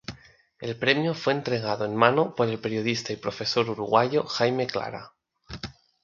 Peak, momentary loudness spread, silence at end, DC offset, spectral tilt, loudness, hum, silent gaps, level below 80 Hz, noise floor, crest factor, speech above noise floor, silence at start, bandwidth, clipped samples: -4 dBFS; 17 LU; 0.3 s; under 0.1%; -5 dB/octave; -25 LUFS; none; none; -58 dBFS; -49 dBFS; 22 dB; 24 dB; 0.1 s; 7.6 kHz; under 0.1%